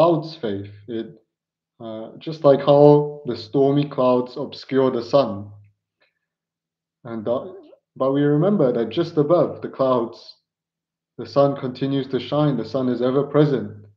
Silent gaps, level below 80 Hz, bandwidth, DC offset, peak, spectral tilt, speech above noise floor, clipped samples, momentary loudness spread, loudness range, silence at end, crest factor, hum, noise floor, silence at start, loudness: none; -72 dBFS; 6.4 kHz; under 0.1%; 0 dBFS; -9 dB/octave; 67 dB; under 0.1%; 15 LU; 7 LU; 0.15 s; 20 dB; none; -87 dBFS; 0 s; -20 LUFS